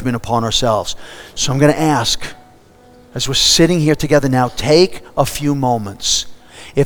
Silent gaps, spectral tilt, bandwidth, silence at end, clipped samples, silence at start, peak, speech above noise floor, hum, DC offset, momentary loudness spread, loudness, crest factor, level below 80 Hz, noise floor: none; -4 dB/octave; over 20 kHz; 0 s; under 0.1%; 0 s; 0 dBFS; 30 dB; none; under 0.1%; 12 LU; -15 LUFS; 16 dB; -36 dBFS; -45 dBFS